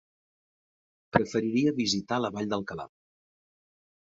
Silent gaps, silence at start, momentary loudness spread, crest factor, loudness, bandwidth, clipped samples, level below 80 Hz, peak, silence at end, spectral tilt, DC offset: none; 1.15 s; 13 LU; 26 dB; -28 LUFS; 8 kHz; under 0.1%; -62 dBFS; -6 dBFS; 1.2 s; -5 dB/octave; under 0.1%